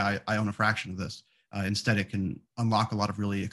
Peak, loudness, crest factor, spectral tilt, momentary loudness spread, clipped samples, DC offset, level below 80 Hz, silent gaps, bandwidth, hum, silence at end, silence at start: -10 dBFS; -29 LUFS; 18 dB; -5.5 dB/octave; 10 LU; under 0.1%; under 0.1%; -60 dBFS; none; 12.5 kHz; none; 0 s; 0 s